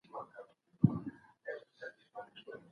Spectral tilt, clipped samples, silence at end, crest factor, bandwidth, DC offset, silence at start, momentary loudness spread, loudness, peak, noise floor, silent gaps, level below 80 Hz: -10 dB/octave; under 0.1%; 0.1 s; 28 dB; 6.4 kHz; under 0.1%; 0.15 s; 20 LU; -38 LUFS; -12 dBFS; -57 dBFS; none; -68 dBFS